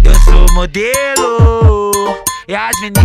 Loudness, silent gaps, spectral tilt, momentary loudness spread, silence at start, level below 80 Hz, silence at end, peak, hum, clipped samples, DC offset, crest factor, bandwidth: -11 LUFS; none; -4.5 dB/octave; 7 LU; 0 s; -10 dBFS; 0 s; 0 dBFS; none; 2%; under 0.1%; 8 dB; 15.5 kHz